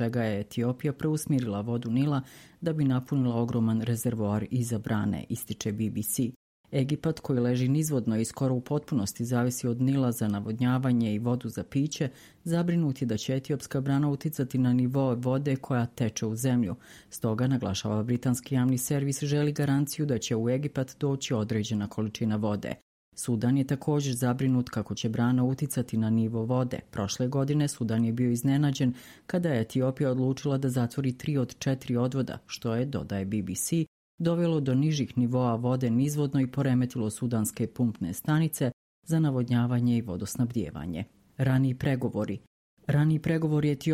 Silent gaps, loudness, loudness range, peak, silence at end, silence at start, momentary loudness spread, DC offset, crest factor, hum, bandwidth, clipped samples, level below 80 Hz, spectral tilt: 6.36-6.64 s, 22.82-23.12 s, 33.87-34.18 s, 38.73-39.02 s, 42.47-42.77 s; -28 LUFS; 2 LU; -12 dBFS; 0 s; 0 s; 7 LU; under 0.1%; 14 dB; none; 16 kHz; under 0.1%; -60 dBFS; -6.5 dB/octave